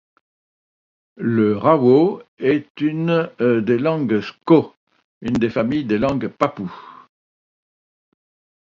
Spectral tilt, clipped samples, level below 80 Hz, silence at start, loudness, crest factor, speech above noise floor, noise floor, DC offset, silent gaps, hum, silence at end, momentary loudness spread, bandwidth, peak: -8.5 dB/octave; under 0.1%; -54 dBFS; 1.2 s; -19 LUFS; 20 dB; over 72 dB; under -90 dBFS; under 0.1%; 2.28-2.37 s, 2.70-2.75 s, 4.77-4.87 s, 5.04-5.21 s; none; 1.8 s; 10 LU; 7.4 kHz; 0 dBFS